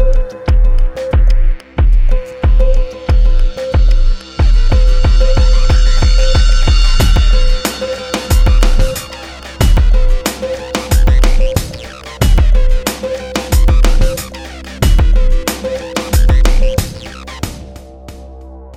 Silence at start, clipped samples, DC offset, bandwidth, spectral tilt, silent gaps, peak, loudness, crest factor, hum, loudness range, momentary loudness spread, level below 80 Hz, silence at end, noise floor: 0 s; under 0.1%; under 0.1%; 15 kHz; -5 dB/octave; none; 0 dBFS; -14 LUFS; 10 dB; none; 3 LU; 14 LU; -10 dBFS; 0.05 s; -31 dBFS